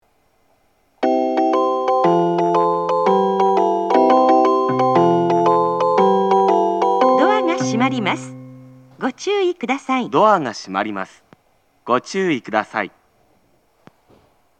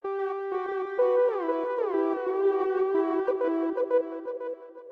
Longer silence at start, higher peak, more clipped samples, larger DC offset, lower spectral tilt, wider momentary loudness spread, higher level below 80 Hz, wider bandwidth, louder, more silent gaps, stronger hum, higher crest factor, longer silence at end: first, 1 s vs 0.05 s; first, 0 dBFS vs -14 dBFS; neither; neither; about the same, -6 dB/octave vs -6.5 dB/octave; about the same, 10 LU vs 10 LU; first, -70 dBFS vs -76 dBFS; first, 9 kHz vs 4.9 kHz; first, -17 LUFS vs -27 LUFS; neither; neither; about the same, 16 dB vs 12 dB; first, 1.7 s vs 0 s